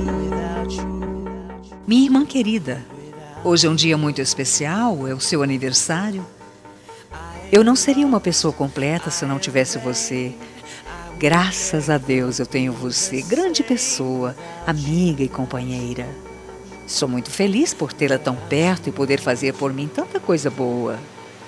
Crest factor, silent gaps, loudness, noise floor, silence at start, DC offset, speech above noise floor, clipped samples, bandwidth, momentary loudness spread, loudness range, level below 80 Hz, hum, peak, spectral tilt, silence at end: 20 dB; none; -20 LUFS; -43 dBFS; 0 s; under 0.1%; 23 dB; under 0.1%; 13 kHz; 18 LU; 4 LU; -44 dBFS; none; 0 dBFS; -4 dB/octave; 0 s